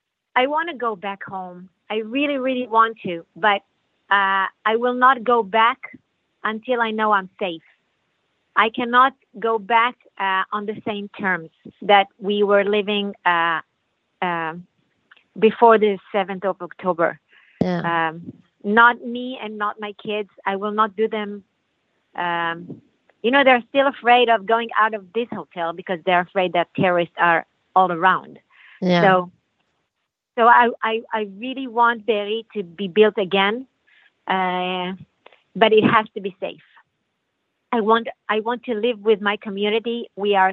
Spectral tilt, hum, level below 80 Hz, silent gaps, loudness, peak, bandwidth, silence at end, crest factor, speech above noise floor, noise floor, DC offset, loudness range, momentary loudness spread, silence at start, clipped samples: -7.5 dB/octave; none; -70 dBFS; none; -20 LUFS; 0 dBFS; 6 kHz; 0 s; 20 dB; 58 dB; -78 dBFS; under 0.1%; 4 LU; 14 LU; 0.35 s; under 0.1%